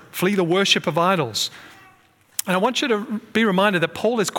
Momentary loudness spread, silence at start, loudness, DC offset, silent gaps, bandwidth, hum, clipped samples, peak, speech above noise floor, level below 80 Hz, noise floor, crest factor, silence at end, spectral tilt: 7 LU; 0.15 s; -20 LUFS; under 0.1%; none; 18 kHz; none; under 0.1%; -4 dBFS; 35 dB; -68 dBFS; -55 dBFS; 18 dB; 0 s; -4 dB/octave